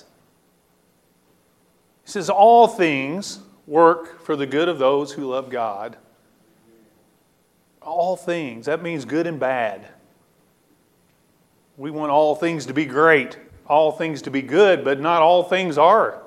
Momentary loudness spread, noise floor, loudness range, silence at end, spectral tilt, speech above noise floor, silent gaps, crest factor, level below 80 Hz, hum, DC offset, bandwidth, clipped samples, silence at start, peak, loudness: 14 LU; -61 dBFS; 10 LU; 0.05 s; -5 dB/octave; 43 dB; none; 20 dB; -70 dBFS; none; under 0.1%; 13 kHz; under 0.1%; 2.1 s; 0 dBFS; -19 LUFS